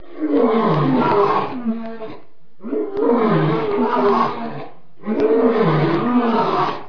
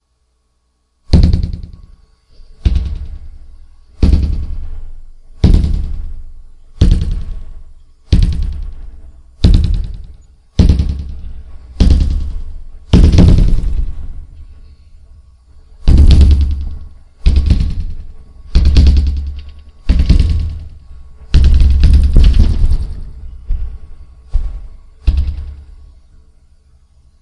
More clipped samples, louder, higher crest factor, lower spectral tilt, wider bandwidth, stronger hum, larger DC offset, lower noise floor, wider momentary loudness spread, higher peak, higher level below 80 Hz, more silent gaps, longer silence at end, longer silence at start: neither; second, -18 LUFS vs -14 LUFS; about the same, 14 dB vs 12 dB; first, -9 dB/octave vs -7.5 dB/octave; second, 5.4 kHz vs 10 kHz; neither; first, 3% vs under 0.1%; second, -46 dBFS vs -61 dBFS; second, 14 LU vs 23 LU; second, -4 dBFS vs 0 dBFS; second, -54 dBFS vs -14 dBFS; neither; second, 0 s vs 1.6 s; second, 0.1 s vs 1.1 s